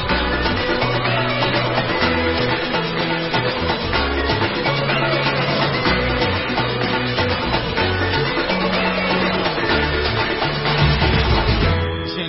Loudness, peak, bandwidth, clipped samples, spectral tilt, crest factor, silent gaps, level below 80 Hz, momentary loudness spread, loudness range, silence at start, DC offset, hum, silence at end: -18 LUFS; -4 dBFS; 5.8 kHz; under 0.1%; -9.5 dB/octave; 14 dB; none; -30 dBFS; 3 LU; 1 LU; 0 s; under 0.1%; none; 0 s